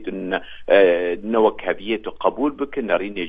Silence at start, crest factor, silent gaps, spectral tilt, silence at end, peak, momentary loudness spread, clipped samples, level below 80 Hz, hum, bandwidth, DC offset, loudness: 0 s; 18 dB; none; -7.5 dB/octave; 0 s; -2 dBFS; 11 LU; under 0.1%; -50 dBFS; none; 4.9 kHz; under 0.1%; -20 LUFS